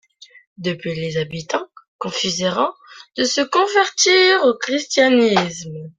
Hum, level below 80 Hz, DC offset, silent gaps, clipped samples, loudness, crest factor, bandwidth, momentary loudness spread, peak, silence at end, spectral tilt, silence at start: none; -60 dBFS; under 0.1%; 1.88-1.99 s; under 0.1%; -17 LUFS; 18 dB; 9.4 kHz; 13 LU; -2 dBFS; 0.1 s; -3 dB/octave; 0.6 s